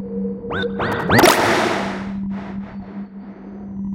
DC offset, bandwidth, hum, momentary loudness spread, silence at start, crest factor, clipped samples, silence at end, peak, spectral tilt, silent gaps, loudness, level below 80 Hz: under 0.1%; 17 kHz; none; 21 LU; 0 s; 20 dB; under 0.1%; 0 s; 0 dBFS; -4.5 dB/octave; none; -18 LUFS; -44 dBFS